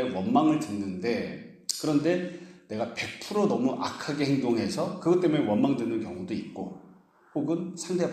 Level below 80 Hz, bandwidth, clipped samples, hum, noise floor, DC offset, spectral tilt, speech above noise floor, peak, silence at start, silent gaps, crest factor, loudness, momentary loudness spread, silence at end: -68 dBFS; 14 kHz; under 0.1%; none; -56 dBFS; under 0.1%; -5.5 dB/octave; 29 dB; -8 dBFS; 0 s; none; 20 dB; -28 LUFS; 13 LU; 0 s